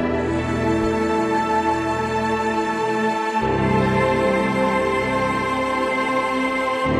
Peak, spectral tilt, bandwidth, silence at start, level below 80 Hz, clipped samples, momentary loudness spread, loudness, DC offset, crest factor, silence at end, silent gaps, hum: -6 dBFS; -6 dB/octave; 13.5 kHz; 0 s; -40 dBFS; under 0.1%; 3 LU; -20 LUFS; under 0.1%; 14 dB; 0 s; none; none